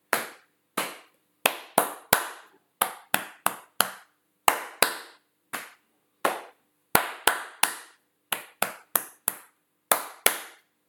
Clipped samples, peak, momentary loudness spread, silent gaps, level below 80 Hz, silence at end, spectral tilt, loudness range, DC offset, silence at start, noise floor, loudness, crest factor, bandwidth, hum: under 0.1%; 0 dBFS; 14 LU; none; -66 dBFS; 0.35 s; -0.5 dB/octave; 2 LU; under 0.1%; 0.1 s; -68 dBFS; -27 LUFS; 30 dB; 19 kHz; none